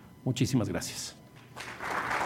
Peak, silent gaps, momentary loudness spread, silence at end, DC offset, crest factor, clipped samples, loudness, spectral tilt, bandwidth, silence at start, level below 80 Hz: -16 dBFS; none; 16 LU; 0 s; under 0.1%; 18 dB; under 0.1%; -33 LUFS; -4.5 dB/octave; 16.5 kHz; 0 s; -58 dBFS